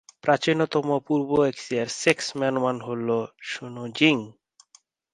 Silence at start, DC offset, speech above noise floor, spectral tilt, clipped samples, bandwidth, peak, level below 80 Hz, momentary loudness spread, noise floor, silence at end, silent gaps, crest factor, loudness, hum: 0.25 s; under 0.1%; 36 dB; -4.5 dB/octave; under 0.1%; 11.5 kHz; -2 dBFS; -66 dBFS; 12 LU; -60 dBFS; 0.8 s; none; 22 dB; -24 LUFS; none